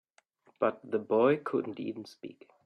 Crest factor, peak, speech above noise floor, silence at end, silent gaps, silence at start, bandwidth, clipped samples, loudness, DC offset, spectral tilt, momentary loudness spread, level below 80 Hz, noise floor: 20 dB; -12 dBFS; 36 dB; 0.35 s; none; 0.6 s; 9.8 kHz; under 0.1%; -31 LUFS; under 0.1%; -7.5 dB/octave; 20 LU; -76 dBFS; -67 dBFS